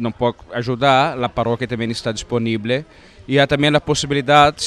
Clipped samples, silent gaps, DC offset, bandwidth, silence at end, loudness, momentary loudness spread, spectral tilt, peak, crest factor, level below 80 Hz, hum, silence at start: under 0.1%; none; under 0.1%; 12 kHz; 0 s; -18 LUFS; 8 LU; -5 dB/octave; 0 dBFS; 18 dB; -44 dBFS; none; 0 s